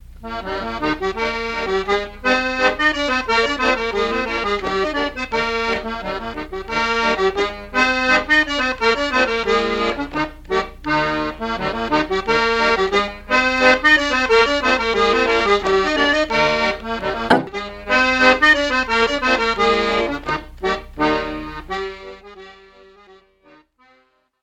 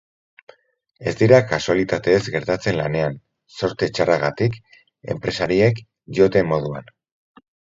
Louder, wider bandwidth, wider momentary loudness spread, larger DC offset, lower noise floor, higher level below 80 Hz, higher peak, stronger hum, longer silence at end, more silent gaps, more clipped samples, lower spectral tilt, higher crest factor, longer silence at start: about the same, -18 LUFS vs -20 LUFS; first, 15.5 kHz vs 7.8 kHz; second, 12 LU vs 15 LU; neither; first, -59 dBFS vs -52 dBFS; first, -38 dBFS vs -50 dBFS; about the same, 0 dBFS vs 0 dBFS; neither; first, 1.9 s vs 0.95 s; neither; neither; second, -3.5 dB/octave vs -6.5 dB/octave; about the same, 18 dB vs 20 dB; second, 0.1 s vs 1 s